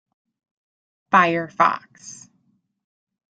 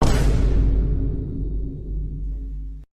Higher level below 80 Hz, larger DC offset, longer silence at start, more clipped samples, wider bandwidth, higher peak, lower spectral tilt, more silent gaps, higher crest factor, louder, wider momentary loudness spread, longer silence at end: second, -68 dBFS vs -22 dBFS; neither; first, 1.1 s vs 0 s; neither; second, 9.2 kHz vs 11 kHz; first, -2 dBFS vs -8 dBFS; second, -4.5 dB/octave vs -7 dB/octave; neither; first, 24 dB vs 14 dB; first, -19 LUFS vs -25 LUFS; first, 23 LU vs 12 LU; first, 1.2 s vs 0.1 s